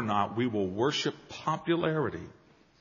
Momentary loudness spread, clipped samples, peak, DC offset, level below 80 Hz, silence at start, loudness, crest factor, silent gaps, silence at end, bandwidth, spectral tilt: 8 LU; under 0.1%; -12 dBFS; under 0.1%; -66 dBFS; 0 s; -30 LUFS; 18 dB; none; 0.5 s; 7.2 kHz; -4 dB/octave